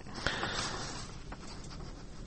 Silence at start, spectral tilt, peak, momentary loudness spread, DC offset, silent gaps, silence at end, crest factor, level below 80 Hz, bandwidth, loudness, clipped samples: 0 s; -3 dB/octave; -8 dBFS; 13 LU; under 0.1%; none; 0 s; 30 dB; -48 dBFS; 8.4 kHz; -39 LUFS; under 0.1%